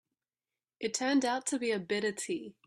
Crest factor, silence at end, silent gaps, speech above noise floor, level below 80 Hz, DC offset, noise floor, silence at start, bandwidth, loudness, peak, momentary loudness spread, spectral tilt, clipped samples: 16 dB; 0.15 s; none; over 57 dB; -78 dBFS; under 0.1%; under -90 dBFS; 0.8 s; 13 kHz; -32 LUFS; -18 dBFS; 8 LU; -3 dB/octave; under 0.1%